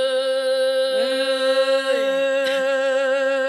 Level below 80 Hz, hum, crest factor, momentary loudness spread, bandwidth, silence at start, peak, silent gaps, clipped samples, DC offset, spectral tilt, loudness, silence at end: under -90 dBFS; none; 12 dB; 2 LU; 12.5 kHz; 0 s; -8 dBFS; none; under 0.1%; under 0.1%; -1.5 dB/octave; -20 LUFS; 0 s